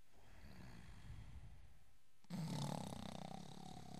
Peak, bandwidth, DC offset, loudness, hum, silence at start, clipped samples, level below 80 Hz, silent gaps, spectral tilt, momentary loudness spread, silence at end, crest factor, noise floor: -32 dBFS; 15.5 kHz; 0.1%; -52 LUFS; none; 0.05 s; under 0.1%; -66 dBFS; none; -5.5 dB/octave; 19 LU; 0 s; 20 dB; -74 dBFS